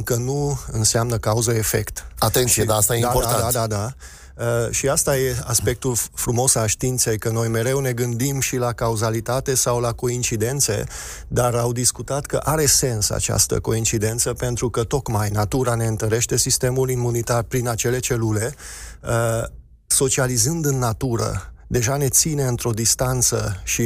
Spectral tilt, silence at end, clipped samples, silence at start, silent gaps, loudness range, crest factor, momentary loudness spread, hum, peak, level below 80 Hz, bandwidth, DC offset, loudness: -4 dB/octave; 0 s; under 0.1%; 0 s; none; 2 LU; 16 dB; 8 LU; none; -4 dBFS; -38 dBFS; 16 kHz; under 0.1%; -20 LUFS